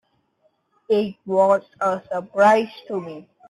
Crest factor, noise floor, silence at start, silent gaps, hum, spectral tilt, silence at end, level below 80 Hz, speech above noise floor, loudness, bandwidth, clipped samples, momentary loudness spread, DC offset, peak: 18 dB; -66 dBFS; 0.9 s; none; none; -6 dB/octave; 0.3 s; -68 dBFS; 46 dB; -21 LUFS; 11.5 kHz; under 0.1%; 14 LU; under 0.1%; -4 dBFS